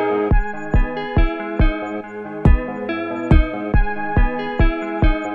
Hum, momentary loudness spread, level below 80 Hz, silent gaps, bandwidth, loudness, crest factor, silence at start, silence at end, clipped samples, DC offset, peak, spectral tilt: none; 7 LU; -20 dBFS; none; 4.6 kHz; -20 LUFS; 16 dB; 0 s; 0 s; under 0.1%; under 0.1%; -2 dBFS; -9 dB/octave